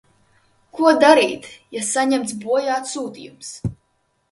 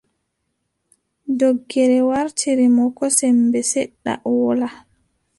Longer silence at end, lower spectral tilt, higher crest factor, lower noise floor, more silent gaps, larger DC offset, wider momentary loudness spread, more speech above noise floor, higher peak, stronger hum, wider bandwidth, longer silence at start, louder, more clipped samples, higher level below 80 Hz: about the same, 0.6 s vs 0.6 s; about the same, -3.5 dB/octave vs -3.5 dB/octave; about the same, 20 dB vs 18 dB; second, -67 dBFS vs -73 dBFS; neither; neither; first, 20 LU vs 10 LU; second, 48 dB vs 56 dB; about the same, 0 dBFS vs -2 dBFS; neither; about the same, 11.5 kHz vs 11.5 kHz; second, 0.75 s vs 1.25 s; about the same, -18 LUFS vs -18 LUFS; neither; first, -52 dBFS vs -62 dBFS